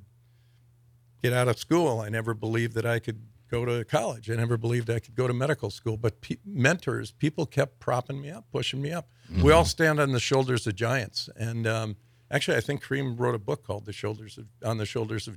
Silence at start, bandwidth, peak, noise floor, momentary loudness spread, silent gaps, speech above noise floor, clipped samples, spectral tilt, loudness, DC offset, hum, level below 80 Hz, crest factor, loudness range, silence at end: 1.25 s; 15.5 kHz; -6 dBFS; -60 dBFS; 11 LU; none; 33 dB; under 0.1%; -5.5 dB/octave; -28 LUFS; under 0.1%; none; -50 dBFS; 22 dB; 5 LU; 0 s